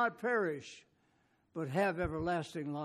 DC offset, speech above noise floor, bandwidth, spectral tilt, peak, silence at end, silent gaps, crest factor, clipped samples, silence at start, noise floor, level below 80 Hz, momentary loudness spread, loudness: under 0.1%; 38 dB; 13.5 kHz; -6.5 dB/octave; -20 dBFS; 0 s; none; 18 dB; under 0.1%; 0 s; -74 dBFS; -58 dBFS; 15 LU; -36 LUFS